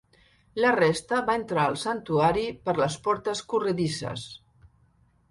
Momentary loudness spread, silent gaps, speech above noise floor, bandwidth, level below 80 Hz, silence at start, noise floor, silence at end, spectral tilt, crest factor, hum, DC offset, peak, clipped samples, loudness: 10 LU; none; 37 dB; 11.5 kHz; -56 dBFS; 0.55 s; -63 dBFS; 0.95 s; -5 dB/octave; 18 dB; none; under 0.1%; -10 dBFS; under 0.1%; -26 LUFS